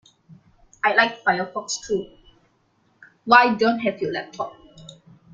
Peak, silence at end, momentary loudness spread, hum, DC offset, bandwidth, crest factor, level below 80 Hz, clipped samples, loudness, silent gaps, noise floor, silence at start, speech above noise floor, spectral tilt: -2 dBFS; 0.4 s; 17 LU; none; under 0.1%; 9.4 kHz; 22 dB; -62 dBFS; under 0.1%; -21 LUFS; none; -64 dBFS; 0.3 s; 43 dB; -3.5 dB/octave